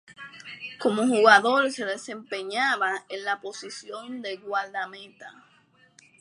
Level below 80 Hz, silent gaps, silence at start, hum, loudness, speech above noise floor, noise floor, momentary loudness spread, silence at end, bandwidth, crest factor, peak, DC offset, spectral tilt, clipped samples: -82 dBFS; none; 0.1 s; none; -24 LUFS; 35 dB; -61 dBFS; 21 LU; 0.9 s; 11.5 kHz; 24 dB; -4 dBFS; under 0.1%; -3 dB/octave; under 0.1%